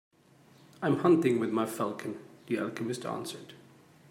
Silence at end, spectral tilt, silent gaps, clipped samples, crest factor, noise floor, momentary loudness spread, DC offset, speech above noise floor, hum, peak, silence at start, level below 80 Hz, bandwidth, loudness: 0.55 s; -6 dB/octave; none; under 0.1%; 18 dB; -60 dBFS; 17 LU; under 0.1%; 31 dB; none; -12 dBFS; 0.8 s; -78 dBFS; 16 kHz; -31 LUFS